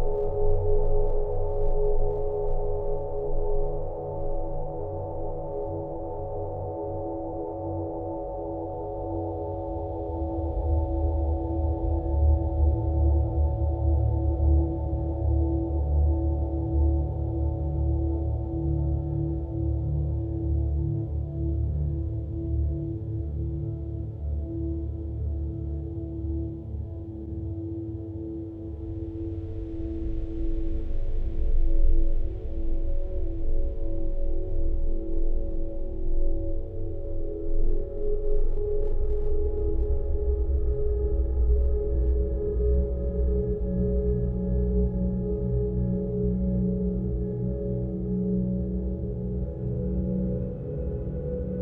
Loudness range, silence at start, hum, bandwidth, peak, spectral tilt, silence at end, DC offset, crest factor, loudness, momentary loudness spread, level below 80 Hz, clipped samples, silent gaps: 8 LU; 0 s; none; 1.7 kHz; -10 dBFS; -13.5 dB/octave; 0 s; under 0.1%; 16 dB; -29 LUFS; 9 LU; -28 dBFS; under 0.1%; none